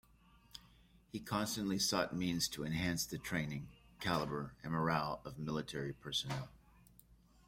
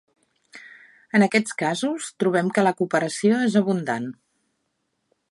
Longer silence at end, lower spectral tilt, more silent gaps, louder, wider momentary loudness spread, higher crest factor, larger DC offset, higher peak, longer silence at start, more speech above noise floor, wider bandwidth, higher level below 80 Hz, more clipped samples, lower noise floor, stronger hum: second, 0.35 s vs 1.2 s; second, -4 dB/octave vs -5.5 dB/octave; neither; second, -39 LUFS vs -22 LUFS; first, 14 LU vs 9 LU; about the same, 20 dB vs 20 dB; neither; second, -20 dBFS vs -4 dBFS; about the same, 0.55 s vs 0.55 s; second, 28 dB vs 53 dB; first, 16.5 kHz vs 11.5 kHz; first, -64 dBFS vs -74 dBFS; neither; second, -67 dBFS vs -74 dBFS; neither